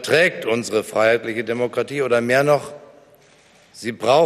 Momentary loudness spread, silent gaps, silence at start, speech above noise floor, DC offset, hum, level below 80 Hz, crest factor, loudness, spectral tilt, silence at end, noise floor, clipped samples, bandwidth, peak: 8 LU; none; 0 s; 34 dB; under 0.1%; none; -64 dBFS; 16 dB; -19 LUFS; -4.5 dB/octave; 0 s; -52 dBFS; under 0.1%; 15 kHz; -4 dBFS